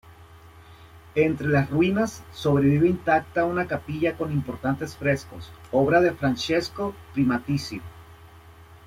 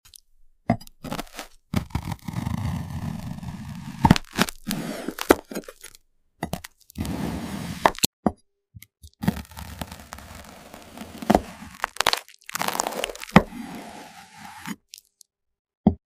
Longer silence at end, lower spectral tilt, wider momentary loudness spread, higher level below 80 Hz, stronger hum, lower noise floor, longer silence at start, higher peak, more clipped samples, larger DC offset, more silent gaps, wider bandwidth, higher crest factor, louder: about the same, 0.1 s vs 0.15 s; first, -6.5 dB/octave vs -4.5 dB/octave; second, 10 LU vs 22 LU; second, -52 dBFS vs -44 dBFS; neither; second, -48 dBFS vs -56 dBFS; second, 0.05 s vs 0.45 s; second, -8 dBFS vs 0 dBFS; neither; neither; second, none vs 8.06-8.23 s, 15.59-15.65 s, 15.77-15.84 s; about the same, 15.5 kHz vs 16 kHz; second, 18 dB vs 28 dB; about the same, -24 LUFS vs -26 LUFS